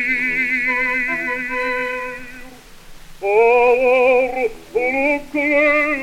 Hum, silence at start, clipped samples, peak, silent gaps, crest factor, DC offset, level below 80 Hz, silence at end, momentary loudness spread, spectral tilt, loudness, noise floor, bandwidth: none; 0 s; under 0.1%; -2 dBFS; none; 16 dB; under 0.1%; -44 dBFS; 0 s; 10 LU; -4 dB/octave; -17 LUFS; -39 dBFS; 16 kHz